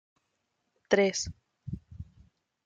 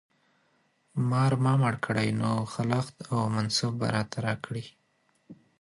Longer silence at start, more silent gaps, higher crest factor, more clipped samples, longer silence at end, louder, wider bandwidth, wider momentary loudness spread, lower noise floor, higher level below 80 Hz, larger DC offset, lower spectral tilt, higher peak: about the same, 0.9 s vs 0.95 s; neither; about the same, 24 dB vs 20 dB; neither; first, 0.65 s vs 0.25 s; about the same, -28 LUFS vs -28 LUFS; second, 9.4 kHz vs 11.5 kHz; first, 23 LU vs 10 LU; first, -80 dBFS vs -70 dBFS; first, -56 dBFS vs -62 dBFS; neither; second, -4 dB/octave vs -6 dB/octave; about the same, -10 dBFS vs -10 dBFS